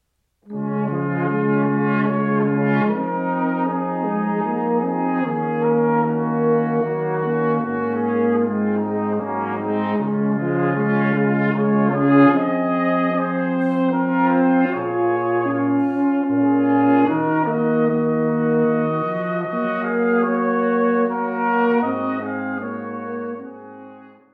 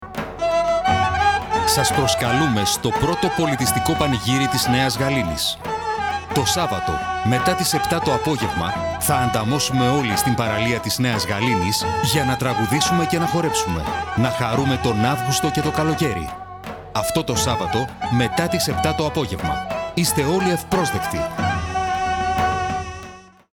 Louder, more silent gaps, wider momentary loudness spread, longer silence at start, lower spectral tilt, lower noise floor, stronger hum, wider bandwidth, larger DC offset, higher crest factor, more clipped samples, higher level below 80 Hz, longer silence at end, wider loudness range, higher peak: about the same, -20 LUFS vs -20 LUFS; neither; about the same, 7 LU vs 6 LU; first, 0.45 s vs 0 s; first, -10.5 dB/octave vs -4 dB/octave; first, -53 dBFS vs -41 dBFS; neither; second, 4.5 kHz vs 19.5 kHz; neither; about the same, 16 dB vs 16 dB; neither; second, -70 dBFS vs -40 dBFS; about the same, 0.25 s vs 0.3 s; about the same, 3 LU vs 3 LU; about the same, -2 dBFS vs -4 dBFS